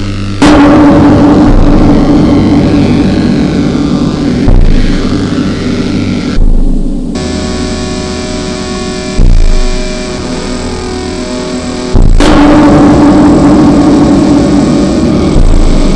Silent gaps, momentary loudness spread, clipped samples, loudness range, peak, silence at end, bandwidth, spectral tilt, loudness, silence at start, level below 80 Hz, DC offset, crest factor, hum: none; 11 LU; 1%; 9 LU; 0 dBFS; 0 s; 10.5 kHz; -6.5 dB/octave; -8 LUFS; 0 s; -10 dBFS; under 0.1%; 6 dB; none